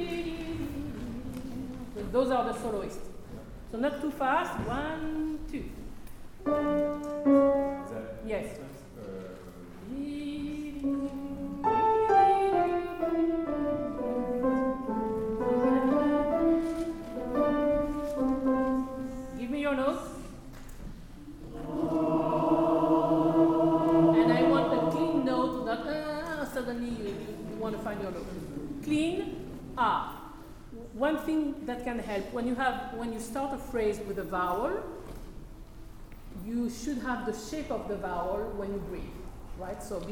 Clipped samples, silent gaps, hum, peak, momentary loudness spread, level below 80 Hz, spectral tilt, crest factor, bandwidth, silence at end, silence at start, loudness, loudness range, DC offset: under 0.1%; none; none; -12 dBFS; 20 LU; -48 dBFS; -6.5 dB/octave; 18 dB; 18 kHz; 0 s; 0 s; -30 LUFS; 9 LU; under 0.1%